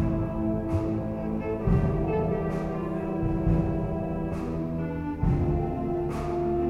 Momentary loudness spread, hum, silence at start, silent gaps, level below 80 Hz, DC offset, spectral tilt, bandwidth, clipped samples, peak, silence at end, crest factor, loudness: 5 LU; none; 0 s; none; -36 dBFS; under 0.1%; -10 dB/octave; 8 kHz; under 0.1%; -12 dBFS; 0 s; 16 dB; -28 LUFS